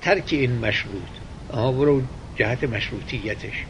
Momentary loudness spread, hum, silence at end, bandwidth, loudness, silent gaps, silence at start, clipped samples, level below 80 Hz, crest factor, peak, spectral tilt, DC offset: 12 LU; none; 0 s; 10.5 kHz; -24 LUFS; none; 0 s; under 0.1%; -40 dBFS; 20 dB; -4 dBFS; -6.5 dB/octave; under 0.1%